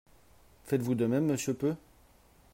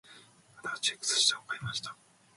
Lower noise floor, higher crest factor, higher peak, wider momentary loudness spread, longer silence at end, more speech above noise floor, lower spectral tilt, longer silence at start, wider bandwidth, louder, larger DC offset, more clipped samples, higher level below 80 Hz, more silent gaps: first, -61 dBFS vs -57 dBFS; second, 16 dB vs 22 dB; second, -16 dBFS vs -12 dBFS; second, 6 LU vs 16 LU; first, 0.75 s vs 0.45 s; first, 32 dB vs 25 dB; first, -6.5 dB/octave vs 0 dB/octave; first, 0.65 s vs 0.1 s; first, 16 kHz vs 11.5 kHz; about the same, -31 LUFS vs -30 LUFS; neither; neither; first, -64 dBFS vs -72 dBFS; neither